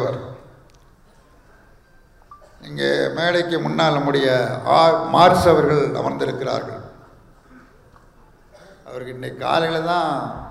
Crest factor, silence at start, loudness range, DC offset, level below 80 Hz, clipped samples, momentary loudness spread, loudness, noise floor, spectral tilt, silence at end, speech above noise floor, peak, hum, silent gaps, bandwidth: 20 dB; 0 s; 12 LU; under 0.1%; -50 dBFS; under 0.1%; 19 LU; -18 LUFS; -51 dBFS; -5.5 dB/octave; 0 s; 33 dB; 0 dBFS; none; none; 15 kHz